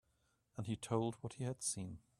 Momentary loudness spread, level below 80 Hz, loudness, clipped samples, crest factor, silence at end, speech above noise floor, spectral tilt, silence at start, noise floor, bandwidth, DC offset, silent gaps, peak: 8 LU; -72 dBFS; -42 LUFS; under 0.1%; 22 dB; 0.2 s; 38 dB; -5 dB/octave; 0.55 s; -80 dBFS; 13.5 kHz; under 0.1%; none; -22 dBFS